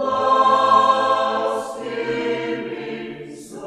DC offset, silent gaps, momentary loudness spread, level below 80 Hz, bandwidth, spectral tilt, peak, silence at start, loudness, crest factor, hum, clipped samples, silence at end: under 0.1%; none; 17 LU; -64 dBFS; 12 kHz; -4 dB/octave; -4 dBFS; 0 s; -19 LUFS; 16 dB; none; under 0.1%; 0 s